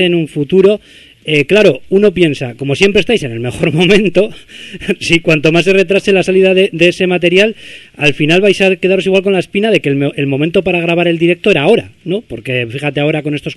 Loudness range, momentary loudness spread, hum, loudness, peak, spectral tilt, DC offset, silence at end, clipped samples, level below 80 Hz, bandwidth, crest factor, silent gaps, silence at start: 2 LU; 10 LU; none; -11 LUFS; 0 dBFS; -5.5 dB/octave; under 0.1%; 0 s; 0.2%; -42 dBFS; 12 kHz; 12 dB; none; 0 s